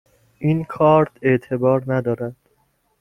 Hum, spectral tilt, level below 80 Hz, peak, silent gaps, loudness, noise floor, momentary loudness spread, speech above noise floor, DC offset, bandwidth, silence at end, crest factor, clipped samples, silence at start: none; -9.5 dB/octave; -54 dBFS; -2 dBFS; none; -19 LUFS; -64 dBFS; 10 LU; 46 dB; under 0.1%; 10 kHz; 0.65 s; 18 dB; under 0.1%; 0.4 s